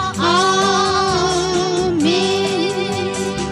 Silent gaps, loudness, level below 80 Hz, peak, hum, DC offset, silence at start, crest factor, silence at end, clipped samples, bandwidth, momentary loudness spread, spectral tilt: none; -16 LUFS; -42 dBFS; -4 dBFS; none; under 0.1%; 0 s; 12 dB; 0 s; under 0.1%; 12.5 kHz; 6 LU; -4 dB/octave